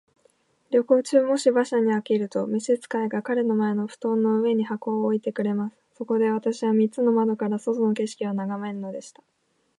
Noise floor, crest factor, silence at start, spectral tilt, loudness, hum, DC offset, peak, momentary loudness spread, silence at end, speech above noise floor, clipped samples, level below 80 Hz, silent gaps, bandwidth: -64 dBFS; 18 dB; 0.7 s; -6.5 dB/octave; -24 LUFS; none; under 0.1%; -6 dBFS; 8 LU; 0.7 s; 41 dB; under 0.1%; -78 dBFS; none; 11.5 kHz